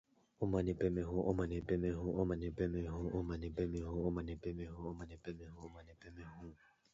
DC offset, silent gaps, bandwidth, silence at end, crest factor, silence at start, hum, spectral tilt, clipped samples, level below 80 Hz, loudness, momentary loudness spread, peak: under 0.1%; none; 7.6 kHz; 0.4 s; 20 dB; 0.4 s; none; -8.5 dB/octave; under 0.1%; -52 dBFS; -40 LUFS; 17 LU; -22 dBFS